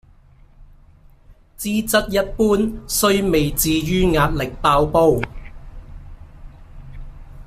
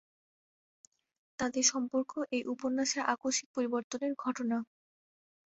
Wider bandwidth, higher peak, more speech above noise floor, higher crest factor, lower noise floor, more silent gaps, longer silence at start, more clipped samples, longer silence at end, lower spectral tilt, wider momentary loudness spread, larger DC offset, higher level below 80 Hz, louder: first, 16 kHz vs 8.2 kHz; first, -2 dBFS vs -12 dBFS; second, 31 dB vs over 57 dB; second, 18 dB vs 24 dB; second, -48 dBFS vs under -90 dBFS; second, none vs 3.46-3.54 s, 3.84-3.90 s; second, 0.6 s vs 1.4 s; neither; second, 0 s vs 0.95 s; first, -4.5 dB/octave vs -1.5 dB/octave; about the same, 8 LU vs 8 LU; neither; first, -34 dBFS vs -76 dBFS; first, -18 LUFS vs -33 LUFS